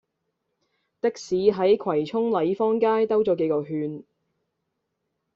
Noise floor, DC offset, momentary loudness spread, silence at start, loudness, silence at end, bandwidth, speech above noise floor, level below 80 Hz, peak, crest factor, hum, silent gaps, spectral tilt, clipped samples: -79 dBFS; under 0.1%; 9 LU; 1.05 s; -23 LUFS; 1.35 s; 7.4 kHz; 56 dB; -66 dBFS; -8 dBFS; 18 dB; none; none; -5.5 dB/octave; under 0.1%